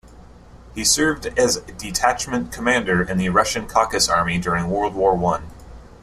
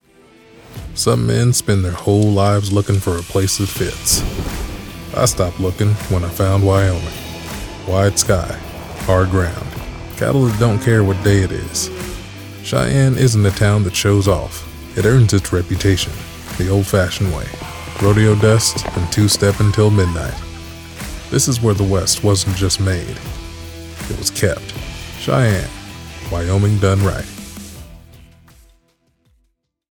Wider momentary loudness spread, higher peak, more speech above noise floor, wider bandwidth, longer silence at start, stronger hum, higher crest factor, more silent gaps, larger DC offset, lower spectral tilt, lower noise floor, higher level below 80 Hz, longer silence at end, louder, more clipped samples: second, 7 LU vs 16 LU; about the same, -2 dBFS vs 0 dBFS; second, 24 dB vs 51 dB; second, 15 kHz vs 19 kHz; second, 0.05 s vs 0.7 s; neither; about the same, 18 dB vs 16 dB; neither; neither; second, -3.5 dB/octave vs -5 dB/octave; second, -44 dBFS vs -65 dBFS; second, -40 dBFS vs -32 dBFS; second, 0.15 s vs 1.75 s; second, -19 LUFS vs -16 LUFS; neither